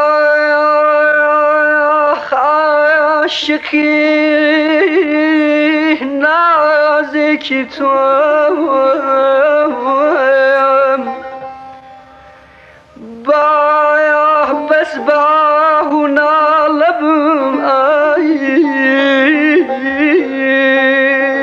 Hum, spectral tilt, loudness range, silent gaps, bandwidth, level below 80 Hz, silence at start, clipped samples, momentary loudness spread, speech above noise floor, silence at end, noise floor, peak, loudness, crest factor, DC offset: none; -4 dB/octave; 3 LU; none; 7.4 kHz; -58 dBFS; 0 s; under 0.1%; 4 LU; 30 dB; 0 s; -41 dBFS; 0 dBFS; -11 LUFS; 12 dB; under 0.1%